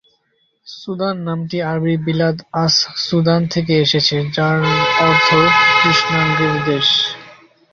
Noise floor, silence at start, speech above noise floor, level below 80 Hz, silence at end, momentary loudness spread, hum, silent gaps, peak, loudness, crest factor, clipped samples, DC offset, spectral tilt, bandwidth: -63 dBFS; 0.65 s; 48 dB; -50 dBFS; 0.4 s; 11 LU; none; none; 0 dBFS; -14 LUFS; 16 dB; under 0.1%; under 0.1%; -4.5 dB/octave; 7.4 kHz